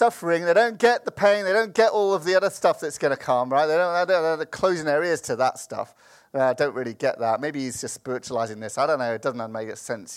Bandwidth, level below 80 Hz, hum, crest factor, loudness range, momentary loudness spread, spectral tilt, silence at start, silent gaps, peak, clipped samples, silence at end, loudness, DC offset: 15.5 kHz; -68 dBFS; none; 18 dB; 6 LU; 12 LU; -4 dB/octave; 0 s; none; -4 dBFS; under 0.1%; 0 s; -23 LUFS; under 0.1%